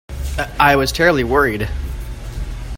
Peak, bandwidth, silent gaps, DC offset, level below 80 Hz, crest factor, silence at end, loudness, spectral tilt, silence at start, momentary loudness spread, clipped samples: 0 dBFS; 16.5 kHz; none; under 0.1%; -26 dBFS; 18 dB; 0 s; -16 LUFS; -5 dB/octave; 0.1 s; 16 LU; under 0.1%